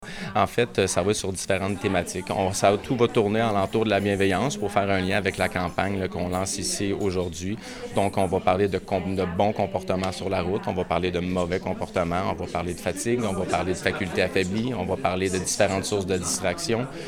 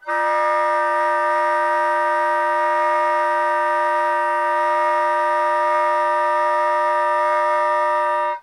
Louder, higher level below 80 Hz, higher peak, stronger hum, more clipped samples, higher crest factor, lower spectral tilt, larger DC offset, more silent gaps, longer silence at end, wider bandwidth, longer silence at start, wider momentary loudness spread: second, -25 LUFS vs -18 LUFS; first, -50 dBFS vs -78 dBFS; about the same, -6 dBFS vs -8 dBFS; neither; neither; first, 20 dB vs 10 dB; first, -4.5 dB/octave vs -1 dB/octave; neither; neither; about the same, 0 s vs 0 s; first, 17.5 kHz vs 11.5 kHz; about the same, 0 s vs 0.05 s; first, 5 LU vs 1 LU